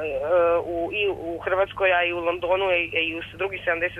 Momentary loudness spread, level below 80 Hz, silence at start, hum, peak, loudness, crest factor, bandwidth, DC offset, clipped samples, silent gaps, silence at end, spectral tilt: 7 LU; -52 dBFS; 0 s; none; -10 dBFS; -23 LUFS; 14 dB; 4.3 kHz; under 0.1%; under 0.1%; none; 0 s; -6 dB/octave